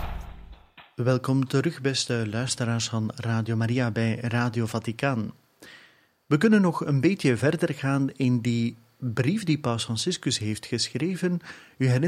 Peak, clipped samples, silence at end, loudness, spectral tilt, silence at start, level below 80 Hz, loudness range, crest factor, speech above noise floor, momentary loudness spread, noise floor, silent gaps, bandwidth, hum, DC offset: -8 dBFS; under 0.1%; 0 s; -26 LUFS; -5.5 dB/octave; 0 s; -50 dBFS; 3 LU; 18 dB; 34 dB; 8 LU; -58 dBFS; none; 14 kHz; none; under 0.1%